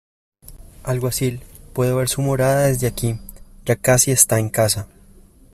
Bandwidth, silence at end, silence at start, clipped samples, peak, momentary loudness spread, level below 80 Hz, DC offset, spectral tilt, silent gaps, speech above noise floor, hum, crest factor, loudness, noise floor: 16 kHz; 0.7 s; 0.5 s; under 0.1%; 0 dBFS; 17 LU; -42 dBFS; under 0.1%; -4.5 dB/octave; none; 29 dB; none; 20 dB; -18 LUFS; -47 dBFS